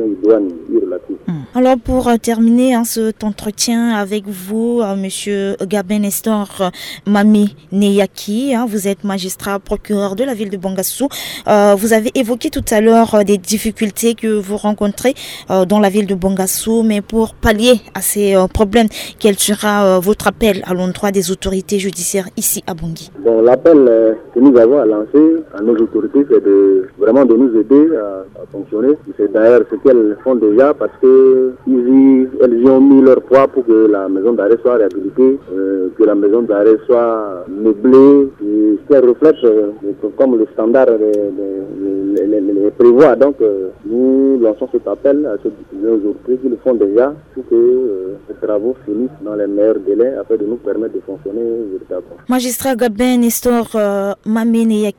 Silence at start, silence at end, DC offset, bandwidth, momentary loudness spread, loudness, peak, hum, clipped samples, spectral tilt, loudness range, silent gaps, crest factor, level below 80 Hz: 0 s; 0.1 s; under 0.1%; 18 kHz; 11 LU; -13 LUFS; 0 dBFS; none; 0.1%; -5 dB/octave; 6 LU; none; 12 dB; -40 dBFS